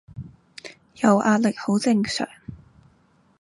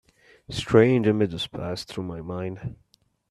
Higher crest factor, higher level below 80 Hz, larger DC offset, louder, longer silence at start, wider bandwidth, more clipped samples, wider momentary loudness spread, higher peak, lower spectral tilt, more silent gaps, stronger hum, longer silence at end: about the same, 20 dB vs 22 dB; about the same, -56 dBFS vs -52 dBFS; neither; first, -21 LUFS vs -24 LUFS; second, 0.15 s vs 0.5 s; about the same, 11.5 kHz vs 12.5 kHz; neither; first, 23 LU vs 16 LU; about the same, -4 dBFS vs -4 dBFS; about the same, -5.5 dB/octave vs -6.5 dB/octave; neither; neither; first, 0.85 s vs 0.6 s